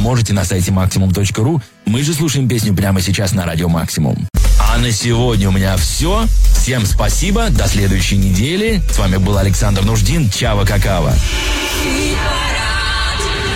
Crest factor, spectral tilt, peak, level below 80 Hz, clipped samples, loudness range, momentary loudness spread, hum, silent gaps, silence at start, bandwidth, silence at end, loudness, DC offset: 10 dB; -4.5 dB/octave; -2 dBFS; -18 dBFS; under 0.1%; 1 LU; 2 LU; none; none; 0 s; 16.5 kHz; 0 s; -14 LUFS; under 0.1%